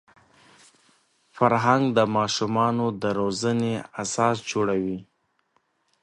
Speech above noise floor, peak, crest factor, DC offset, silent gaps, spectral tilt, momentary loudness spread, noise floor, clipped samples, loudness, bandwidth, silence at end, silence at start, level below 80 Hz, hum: 46 dB; -4 dBFS; 20 dB; under 0.1%; none; -5 dB/octave; 8 LU; -69 dBFS; under 0.1%; -24 LUFS; 11.5 kHz; 1 s; 1.35 s; -62 dBFS; none